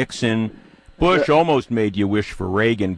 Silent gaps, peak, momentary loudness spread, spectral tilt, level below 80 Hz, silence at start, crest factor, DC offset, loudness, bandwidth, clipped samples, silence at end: none; -4 dBFS; 8 LU; -6 dB/octave; -40 dBFS; 0 s; 14 dB; under 0.1%; -19 LUFS; 10.5 kHz; under 0.1%; 0 s